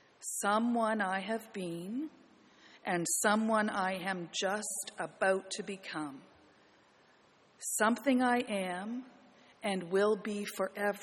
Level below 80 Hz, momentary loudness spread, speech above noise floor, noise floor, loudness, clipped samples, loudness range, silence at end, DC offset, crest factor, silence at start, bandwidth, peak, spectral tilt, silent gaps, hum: -80 dBFS; 12 LU; 32 dB; -65 dBFS; -33 LUFS; under 0.1%; 4 LU; 0 s; under 0.1%; 20 dB; 0.2 s; 14 kHz; -14 dBFS; -3.5 dB/octave; none; none